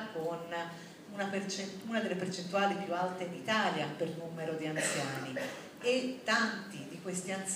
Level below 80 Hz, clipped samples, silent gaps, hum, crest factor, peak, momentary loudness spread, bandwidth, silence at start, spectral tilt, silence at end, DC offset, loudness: -80 dBFS; under 0.1%; none; none; 20 dB; -16 dBFS; 9 LU; 15.5 kHz; 0 s; -3.5 dB/octave; 0 s; under 0.1%; -35 LUFS